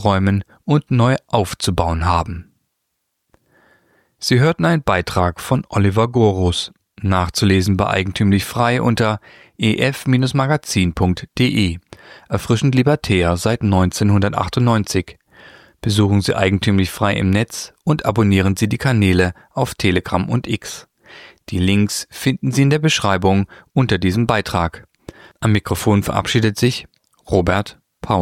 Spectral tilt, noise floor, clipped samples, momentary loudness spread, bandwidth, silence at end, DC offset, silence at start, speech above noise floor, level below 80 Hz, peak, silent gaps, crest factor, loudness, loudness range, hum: -6 dB/octave; -73 dBFS; under 0.1%; 8 LU; 16 kHz; 0 s; under 0.1%; 0 s; 57 dB; -38 dBFS; -2 dBFS; none; 16 dB; -17 LUFS; 3 LU; none